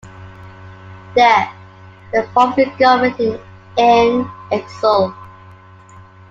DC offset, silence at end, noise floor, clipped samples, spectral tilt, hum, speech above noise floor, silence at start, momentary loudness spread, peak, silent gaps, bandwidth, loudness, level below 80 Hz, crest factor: under 0.1%; 1 s; -41 dBFS; under 0.1%; -5.5 dB/octave; none; 27 dB; 0.05 s; 11 LU; 0 dBFS; none; 7.6 kHz; -15 LUFS; -52 dBFS; 16 dB